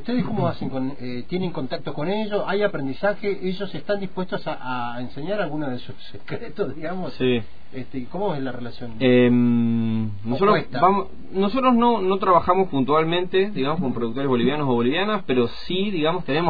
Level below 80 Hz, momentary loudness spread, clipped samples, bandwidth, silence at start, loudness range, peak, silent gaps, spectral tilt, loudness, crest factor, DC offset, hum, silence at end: -50 dBFS; 13 LU; under 0.1%; 5 kHz; 0 s; 8 LU; -4 dBFS; none; -9 dB/octave; -23 LUFS; 18 dB; 4%; none; 0 s